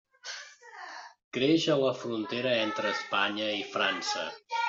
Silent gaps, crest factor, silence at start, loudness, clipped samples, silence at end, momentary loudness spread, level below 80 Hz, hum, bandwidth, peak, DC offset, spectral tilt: 1.24-1.32 s; 20 dB; 0.25 s; -29 LUFS; under 0.1%; 0 s; 18 LU; -76 dBFS; none; 7.8 kHz; -12 dBFS; under 0.1%; -2 dB/octave